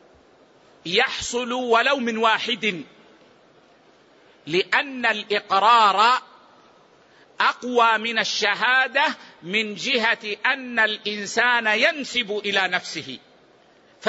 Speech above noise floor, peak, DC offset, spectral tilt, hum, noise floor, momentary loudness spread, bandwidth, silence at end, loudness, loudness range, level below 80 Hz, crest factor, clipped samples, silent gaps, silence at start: 33 dB; -6 dBFS; under 0.1%; -2 dB/octave; none; -55 dBFS; 8 LU; 8 kHz; 0 s; -20 LUFS; 4 LU; -64 dBFS; 18 dB; under 0.1%; none; 0.85 s